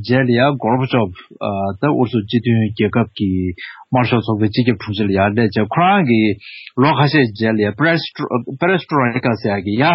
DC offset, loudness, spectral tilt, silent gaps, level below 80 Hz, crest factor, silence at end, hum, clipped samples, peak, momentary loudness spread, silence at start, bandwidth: under 0.1%; -16 LUFS; -5.5 dB/octave; none; -52 dBFS; 14 dB; 0 s; none; under 0.1%; 0 dBFS; 8 LU; 0 s; 5.8 kHz